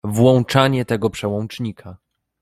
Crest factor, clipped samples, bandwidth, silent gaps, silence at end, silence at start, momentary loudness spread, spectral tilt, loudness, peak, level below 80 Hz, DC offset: 18 dB; under 0.1%; 14.5 kHz; none; 0.45 s; 0.05 s; 13 LU; -6.5 dB/octave; -18 LUFS; 0 dBFS; -52 dBFS; under 0.1%